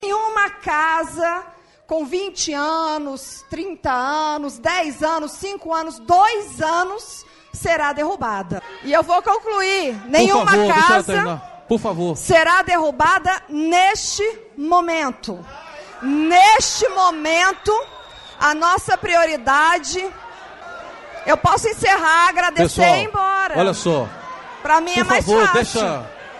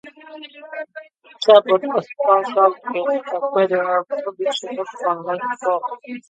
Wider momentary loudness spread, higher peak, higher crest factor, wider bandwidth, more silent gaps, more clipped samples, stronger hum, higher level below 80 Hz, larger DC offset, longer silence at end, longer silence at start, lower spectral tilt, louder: second, 17 LU vs 21 LU; about the same, -2 dBFS vs 0 dBFS; about the same, 16 dB vs 20 dB; first, 12 kHz vs 9 kHz; neither; neither; neither; first, -46 dBFS vs -74 dBFS; neither; about the same, 0 s vs 0.1 s; about the same, 0 s vs 0.05 s; second, -3 dB/octave vs -4.5 dB/octave; about the same, -17 LUFS vs -19 LUFS